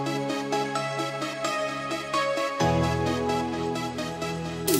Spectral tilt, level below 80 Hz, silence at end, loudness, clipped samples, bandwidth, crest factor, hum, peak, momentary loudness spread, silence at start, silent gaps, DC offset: -4.5 dB/octave; -50 dBFS; 0 s; -28 LUFS; under 0.1%; 16 kHz; 16 dB; none; -10 dBFS; 6 LU; 0 s; none; under 0.1%